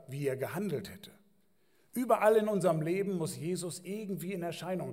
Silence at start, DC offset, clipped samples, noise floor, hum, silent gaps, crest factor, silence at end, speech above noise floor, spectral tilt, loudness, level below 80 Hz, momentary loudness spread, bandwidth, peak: 0.1 s; under 0.1%; under 0.1%; -72 dBFS; none; none; 20 dB; 0 s; 40 dB; -6 dB/octave; -33 LUFS; -78 dBFS; 13 LU; 16 kHz; -14 dBFS